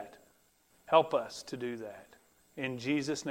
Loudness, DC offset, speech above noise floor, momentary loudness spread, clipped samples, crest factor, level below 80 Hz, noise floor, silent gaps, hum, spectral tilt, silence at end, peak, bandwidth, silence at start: -33 LUFS; under 0.1%; 36 dB; 22 LU; under 0.1%; 24 dB; -74 dBFS; -68 dBFS; none; none; -4.5 dB/octave; 0 s; -10 dBFS; 16 kHz; 0 s